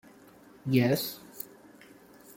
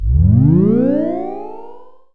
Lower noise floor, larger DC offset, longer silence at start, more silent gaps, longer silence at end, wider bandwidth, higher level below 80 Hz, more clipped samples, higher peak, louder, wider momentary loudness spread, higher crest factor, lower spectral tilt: first, -55 dBFS vs -39 dBFS; second, under 0.1% vs 2%; first, 0.65 s vs 0 s; neither; about the same, 0.05 s vs 0 s; first, 17 kHz vs 3.3 kHz; second, -68 dBFS vs -24 dBFS; neither; second, -10 dBFS vs 0 dBFS; second, -29 LUFS vs -13 LUFS; about the same, 17 LU vs 17 LU; first, 22 dB vs 14 dB; second, -6 dB/octave vs -13 dB/octave